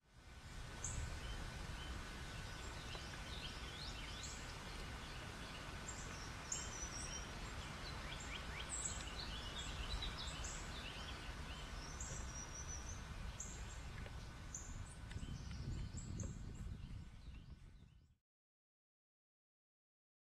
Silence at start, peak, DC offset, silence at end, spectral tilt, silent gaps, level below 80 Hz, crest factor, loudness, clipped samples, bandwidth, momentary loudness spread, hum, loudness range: 0.05 s; -28 dBFS; under 0.1%; 2.25 s; -3 dB/octave; none; -54 dBFS; 20 dB; -49 LUFS; under 0.1%; 13.5 kHz; 8 LU; none; 6 LU